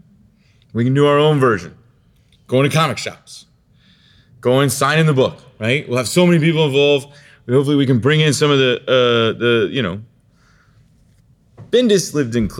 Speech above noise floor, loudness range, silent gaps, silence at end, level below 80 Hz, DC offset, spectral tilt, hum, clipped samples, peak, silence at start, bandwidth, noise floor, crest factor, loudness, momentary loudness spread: 39 dB; 5 LU; none; 0 s; -50 dBFS; under 0.1%; -5.5 dB/octave; none; under 0.1%; -2 dBFS; 0.75 s; 16.5 kHz; -54 dBFS; 14 dB; -15 LUFS; 9 LU